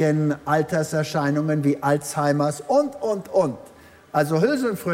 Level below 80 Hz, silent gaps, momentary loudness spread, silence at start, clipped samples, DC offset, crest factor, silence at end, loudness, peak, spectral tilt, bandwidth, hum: -62 dBFS; none; 4 LU; 0 s; under 0.1%; under 0.1%; 16 dB; 0 s; -22 LUFS; -6 dBFS; -6.5 dB/octave; 16 kHz; none